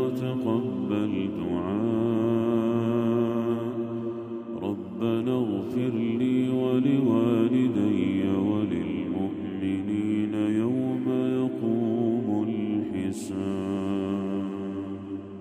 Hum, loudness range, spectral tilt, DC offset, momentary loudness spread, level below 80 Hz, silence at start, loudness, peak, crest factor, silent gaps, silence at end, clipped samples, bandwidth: none; 4 LU; -8 dB/octave; under 0.1%; 8 LU; -64 dBFS; 0 s; -27 LUFS; -10 dBFS; 16 dB; none; 0 s; under 0.1%; 11.5 kHz